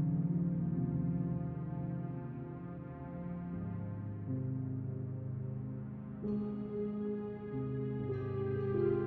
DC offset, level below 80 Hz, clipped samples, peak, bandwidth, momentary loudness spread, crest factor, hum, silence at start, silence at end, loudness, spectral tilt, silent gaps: under 0.1%; -58 dBFS; under 0.1%; -22 dBFS; 3.5 kHz; 10 LU; 16 dB; none; 0 s; 0 s; -39 LUFS; -11 dB/octave; none